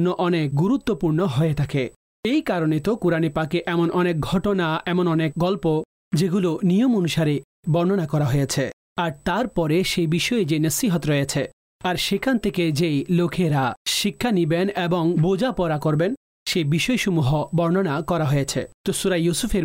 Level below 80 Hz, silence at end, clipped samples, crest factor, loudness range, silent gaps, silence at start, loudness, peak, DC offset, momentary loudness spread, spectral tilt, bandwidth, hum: -46 dBFS; 0 s; under 0.1%; 10 dB; 1 LU; 1.96-2.23 s, 5.85-6.11 s, 7.44-7.63 s, 8.73-8.96 s, 11.53-11.80 s, 13.77-13.85 s, 16.17-16.46 s, 18.74-18.84 s; 0 s; -22 LUFS; -12 dBFS; under 0.1%; 5 LU; -5.5 dB/octave; 16 kHz; none